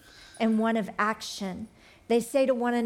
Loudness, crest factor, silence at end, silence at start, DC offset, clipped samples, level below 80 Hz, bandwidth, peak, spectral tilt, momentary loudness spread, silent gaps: -27 LUFS; 16 dB; 0 s; 0.15 s; under 0.1%; under 0.1%; -66 dBFS; 16 kHz; -12 dBFS; -5 dB/octave; 11 LU; none